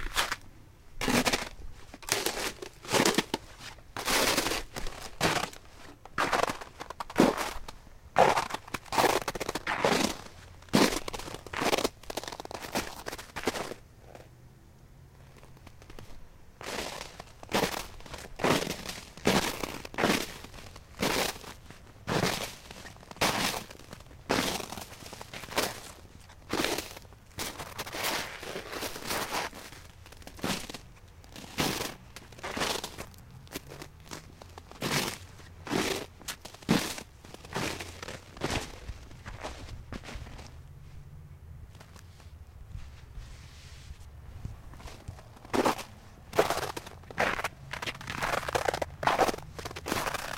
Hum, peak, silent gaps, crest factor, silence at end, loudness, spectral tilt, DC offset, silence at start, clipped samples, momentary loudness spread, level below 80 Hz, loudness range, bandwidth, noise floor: none; -4 dBFS; none; 28 dB; 0 s; -31 LUFS; -3 dB/octave; under 0.1%; 0 s; under 0.1%; 22 LU; -50 dBFS; 15 LU; 17 kHz; -54 dBFS